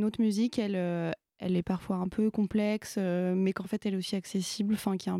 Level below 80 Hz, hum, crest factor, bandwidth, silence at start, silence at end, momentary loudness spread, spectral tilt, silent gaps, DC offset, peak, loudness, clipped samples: -62 dBFS; none; 14 dB; 14.5 kHz; 0 s; 0 s; 5 LU; -6 dB/octave; none; under 0.1%; -16 dBFS; -31 LUFS; under 0.1%